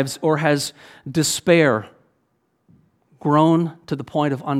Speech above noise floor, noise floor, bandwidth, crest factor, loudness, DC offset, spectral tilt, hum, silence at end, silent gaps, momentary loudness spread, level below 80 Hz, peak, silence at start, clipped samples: 49 dB; -68 dBFS; 16 kHz; 20 dB; -19 LUFS; under 0.1%; -5 dB/octave; none; 0 s; none; 12 LU; -62 dBFS; -2 dBFS; 0 s; under 0.1%